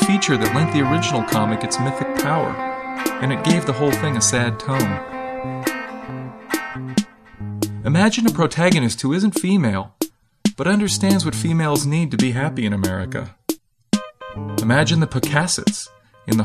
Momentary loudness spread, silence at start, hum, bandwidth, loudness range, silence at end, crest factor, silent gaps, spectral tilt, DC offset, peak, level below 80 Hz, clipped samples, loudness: 12 LU; 0 s; none; 14 kHz; 3 LU; 0 s; 18 dB; none; -5 dB/octave; under 0.1%; -2 dBFS; -50 dBFS; under 0.1%; -20 LUFS